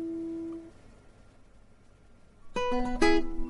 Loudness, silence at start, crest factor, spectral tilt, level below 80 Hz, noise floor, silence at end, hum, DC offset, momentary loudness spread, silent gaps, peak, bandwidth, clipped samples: -31 LUFS; 0 s; 20 dB; -4.5 dB/octave; -44 dBFS; -56 dBFS; 0 s; none; under 0.1%; 17 LU; none; -10 dBFS; 11.5 kHz; under 0.1%